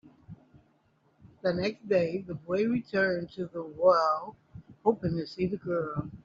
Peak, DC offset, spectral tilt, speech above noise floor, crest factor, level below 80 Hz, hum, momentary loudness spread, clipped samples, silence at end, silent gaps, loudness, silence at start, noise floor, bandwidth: -10 dBFS; under 0.1%; -5.5 dB/octave; 39 dB; 20 dB; -62 dBFS; none; 12 LU; under 0.1%; 0.1 s; none; -29 LUFS; 0.05 s; -68 dBFS; 7.2 kHz